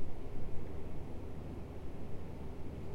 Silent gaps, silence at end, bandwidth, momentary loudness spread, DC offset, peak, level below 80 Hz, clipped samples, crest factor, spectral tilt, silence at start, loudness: none; 0 s; 5 kHz; 1 LU; under 0.1%; -22 dBFS; -46 dBFS; under 0.1%; 12 dB; -8 dB/octave; 0 s; -47 LUFS